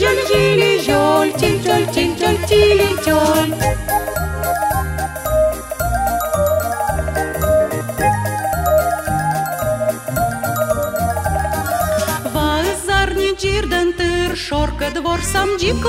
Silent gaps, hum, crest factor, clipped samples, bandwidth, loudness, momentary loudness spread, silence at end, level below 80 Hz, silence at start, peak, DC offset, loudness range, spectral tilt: none; none; 14 dB; under 0.1%; 16.5 kHz; -17 LUFS; 6 LU; 0 s; -30 dBFS; 0 s; -2 dBFS; under 0.1%; 4 LU; -4.5 dB/octave